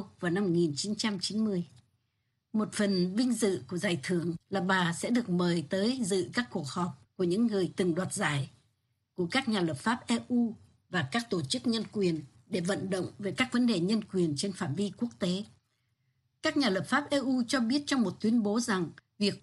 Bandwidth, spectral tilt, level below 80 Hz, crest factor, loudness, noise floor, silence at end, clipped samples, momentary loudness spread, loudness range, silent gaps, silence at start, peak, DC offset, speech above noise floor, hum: 12 kHz; -5 dB/octave; -70 dBFS; 18 dB; -31 LUFS; -79 dBFS; 0.05 s; under 0.1%; 7 LU; 2 LU; none; 0 s; -12 dBFS; under 0.1%; 49 dB; none